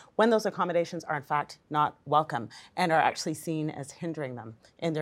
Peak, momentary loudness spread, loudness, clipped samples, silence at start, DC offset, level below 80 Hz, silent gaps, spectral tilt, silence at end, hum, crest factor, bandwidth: -10 dBFS; 12 LU; -29 LUFS; under 0.1%; 0 s; under 0.1%; -74 dBFS; none; -5 dB/octave; 0 s; none; 20 dB; 16.5 kHz